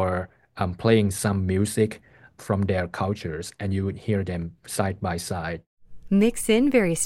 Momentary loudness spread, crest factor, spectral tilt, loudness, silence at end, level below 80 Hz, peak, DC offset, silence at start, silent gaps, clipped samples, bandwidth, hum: 12 LU; 18 dB; -5.5 dB/octave; -25 LUFS; 0 s; -48 dBFS; -6 dBFS; under 0.1%; 0 s; 5.66-5.77 s; under 0.1%; 16.5 kHz; none